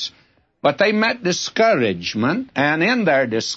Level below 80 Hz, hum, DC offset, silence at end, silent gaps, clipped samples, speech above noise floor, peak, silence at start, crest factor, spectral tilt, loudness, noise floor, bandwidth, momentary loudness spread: -62 dBFS; none; under 0.1%; 0 s; none; under 0.1%; 39 dB; -4 dBFS; 0 s; 16 dB; -4.5 dB/octave; -18 LUFS; -57 dBFS; 8 kHz; 5 LU